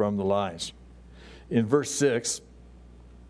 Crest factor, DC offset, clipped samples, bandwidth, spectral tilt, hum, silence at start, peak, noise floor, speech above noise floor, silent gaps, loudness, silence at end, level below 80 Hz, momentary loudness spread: 20 dB; under 0.1%; under 0.1%; 11 kHz; -4.5 dB/octave; none; 0 s; -8 dBFS; -49 dBFS; 23 dB; none; -27 LUFS; 0.05 s; -52 dBFS; 11 LU